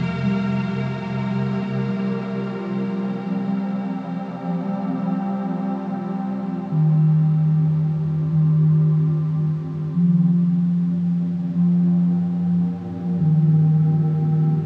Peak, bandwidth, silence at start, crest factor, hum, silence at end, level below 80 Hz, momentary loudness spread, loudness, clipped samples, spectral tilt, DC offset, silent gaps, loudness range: -10 dBFS; 5 kHz; 0 s; 10 dB; none; 0 s; -58 dBFS; 9 LU; -21 LUFS; under 0.1%; -10.5 dB/octave; under 0.1%; none; 6 LU